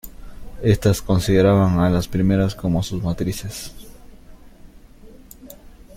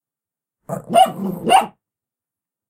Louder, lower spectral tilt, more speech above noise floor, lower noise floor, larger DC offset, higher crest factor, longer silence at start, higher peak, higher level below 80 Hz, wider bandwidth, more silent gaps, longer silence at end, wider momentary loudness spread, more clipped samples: second, -19 LUFS vs -16 LUFS; first, -7 dB/octave vs -4 dB/octave; second, 25 dB vs 73 dB; second, -44 dBFS vs -89 dBFS; neither; about the same, 18 dB vs 18 dB; second, 0.05 s vs 0.7 s; about the same, -4 dBFS vs -2 dBFS; first, -38 dBFS vs -62 dBFS; about the same, 16.5 kHz vs 16 kHz; neither; second, 0.05 s vs 1 s; first, 19 LU vs 16 LU; neither